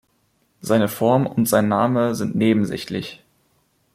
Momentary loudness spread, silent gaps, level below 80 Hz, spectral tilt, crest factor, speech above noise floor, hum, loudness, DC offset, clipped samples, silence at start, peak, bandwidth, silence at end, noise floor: 11 LU; none; -58 dBFS; -6 dB/octave; 16 dB; 46 dB; none; -20 LUFS; under 0.1%; under 0.1%; 0.65 s; -4 dBFS; 16 kHz; 0.8 s; -65 dBFS